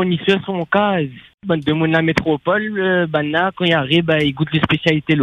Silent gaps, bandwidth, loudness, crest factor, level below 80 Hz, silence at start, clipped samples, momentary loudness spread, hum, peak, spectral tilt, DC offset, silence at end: 1.34-1.38 s; 9.8 kHz; -17 LUFS; 16 dB; -48 dBFS; 0 s; under 0.1%; 4 LU; none; 0 dBFS; -7 dB/octave; under 0.1%; 0 s